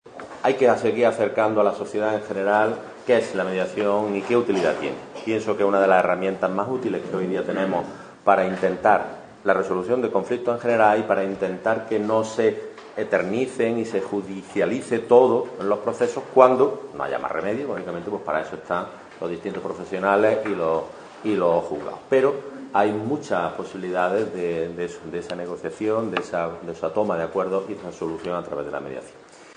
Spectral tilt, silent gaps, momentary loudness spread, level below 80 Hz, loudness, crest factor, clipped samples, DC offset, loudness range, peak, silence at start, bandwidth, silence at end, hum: -6 dB/octave; none; 12 LU; -60 dBFS; -23 LUFS; 22 dB; under 0.1%; under 0.1%; 6 LU; 0 dBFS; 0.05 s; 10 kHz; 0.05 s; none